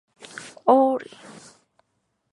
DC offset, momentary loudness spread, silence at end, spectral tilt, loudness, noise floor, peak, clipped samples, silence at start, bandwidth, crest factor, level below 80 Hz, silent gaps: under 0.1%; 24 LU; 1.3 s; -5 dB/octave; -21 LUFS; -74 dBFS; -4 dBFS; under 0.1%; 0.35 s; 11.5 kHz; 22 dB; -78 dBFS; none